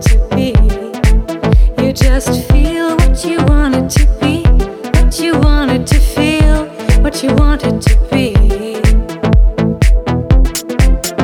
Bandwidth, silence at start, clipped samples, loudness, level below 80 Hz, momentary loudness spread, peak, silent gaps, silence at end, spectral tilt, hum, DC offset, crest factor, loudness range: 15 kHz; 0 s; under 0.1%; -13 LUFS; -12 dBFS; 3 LU; 0 dBFS; none; 0 s; -6 dB/octave; none; under 0.1%; 10 dB; 1 LU